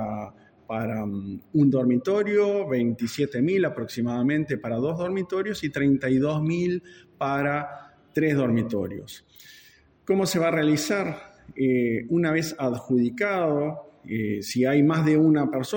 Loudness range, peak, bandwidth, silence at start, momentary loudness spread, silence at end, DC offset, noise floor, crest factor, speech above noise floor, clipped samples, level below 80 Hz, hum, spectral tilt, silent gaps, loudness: 3 LU; -10 dBFS; 17 kHz; 0 s; 12 LU; 0 s; under 0.1%; -55 dBFS; 14 dB; 31 dB; under 0.1%; -62 dBFS; none; -6.5 dB/octave; none; -25 LUFS